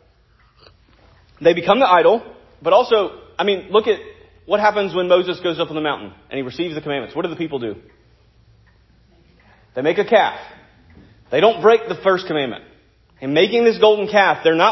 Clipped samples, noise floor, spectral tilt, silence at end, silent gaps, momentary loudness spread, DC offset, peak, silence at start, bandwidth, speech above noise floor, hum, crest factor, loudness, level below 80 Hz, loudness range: under 0.1%; -55 dBFS; -5.5 dB/octave; 0 s; none; 13 LU; under 0.1%; 0 dBFS; 1.4 s; 6 kHz; 38 dB; none; 18 dB; -17 LUFS; -56 dBFS; 10 LU